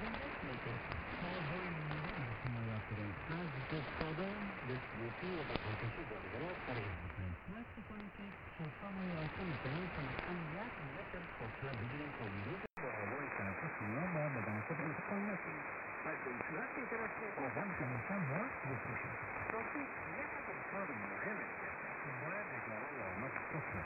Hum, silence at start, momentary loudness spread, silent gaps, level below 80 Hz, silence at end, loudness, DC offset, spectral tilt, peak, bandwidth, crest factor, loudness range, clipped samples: none; 0 s; 5 LU; none; -62 dBFS; 0 s; -43 LUFS; under 0.1%; -8.5 dB/octave; -16 dBFS; 5.4 kHz; 26 dB; 3 LU; under 0.1%